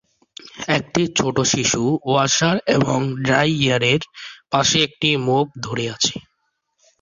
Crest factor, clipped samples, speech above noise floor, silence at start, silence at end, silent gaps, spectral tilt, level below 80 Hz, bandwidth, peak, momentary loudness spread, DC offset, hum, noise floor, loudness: 18 dB; under 0.1%; 53 dB; 0.45 s; 0.8 s; none; -3.5 dB/octave; -52 dBFS; 7.8 kHz; -2 dBFS; 9 LU; under 0.1%; none; -71 dBFS; -18 LUFS